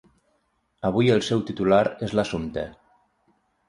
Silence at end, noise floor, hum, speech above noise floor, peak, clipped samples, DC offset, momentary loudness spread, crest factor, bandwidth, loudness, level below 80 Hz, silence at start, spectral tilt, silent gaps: 0.95 s; -70 dBFS; none; 48 dB; -6 dBFS; under 0.1%; under 0.1%; 11 LU; 20 dB; 11.5 kHz; -23 LUFS; -52 dBFS; 0.85 s; -6.5 dB/octave; none